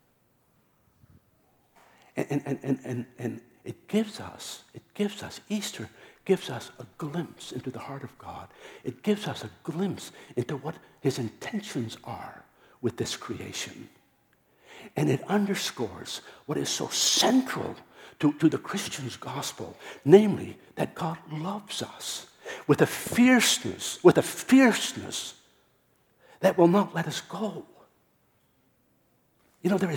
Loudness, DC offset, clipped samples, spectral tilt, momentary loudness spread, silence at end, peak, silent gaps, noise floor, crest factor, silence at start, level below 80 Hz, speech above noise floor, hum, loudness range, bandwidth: -27 LUFS; under 0.1%; under 0.1%; -4.5 dB/octave; 19 LU; 0 s; -4 dBFS; none; -68 dBFS; 26 dB; 2.15 s; -68 dBFS; 40 dB; none; 11 LU; 19 kHz